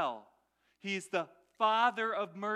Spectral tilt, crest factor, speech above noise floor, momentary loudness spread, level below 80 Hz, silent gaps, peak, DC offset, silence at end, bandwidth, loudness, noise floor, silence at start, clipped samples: -3.5 dB/octave; 18 dB; 41 dB; 17 LU; -88 dBFS; none; -16 dBFS; under 0.1%; 0 s; 13 kHz; -33 LUFS; -74 dBFS; 0 s; under 0.1%